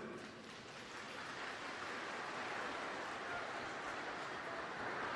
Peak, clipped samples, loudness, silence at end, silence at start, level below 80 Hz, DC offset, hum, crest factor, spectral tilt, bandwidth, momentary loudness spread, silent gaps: -32 dBFS; under 0.1%; -45 LUFS; 0 s; 0 s; -76 dBFS; under 0.1%; none; 14 dB; -3 dB/octave; 11 kHz; 7 LU; none